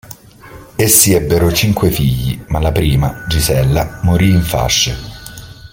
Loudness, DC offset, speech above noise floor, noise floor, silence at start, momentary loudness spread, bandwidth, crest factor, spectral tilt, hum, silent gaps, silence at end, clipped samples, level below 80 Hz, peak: -13 LUFS; under 0.1%; 24 dB; -37 dBFS; 0.1 s; 18 LU; 17 kHz; 14 dB; -4.5 dB/octave; none; none; 0.05 s; under 0.1%; -26 dBFS; 0 dBFS